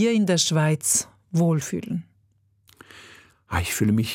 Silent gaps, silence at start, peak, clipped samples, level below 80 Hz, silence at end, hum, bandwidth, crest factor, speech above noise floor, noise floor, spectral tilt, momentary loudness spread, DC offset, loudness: none; 0 s; -8 dBFS; under 0.1%; -54 dBFS; 0 s; none; 17 kHz; 16 dB; 42 dB; -64 dBFS; -4.5 dB/octave; 10 LU; under 0.1%; -23 LUFS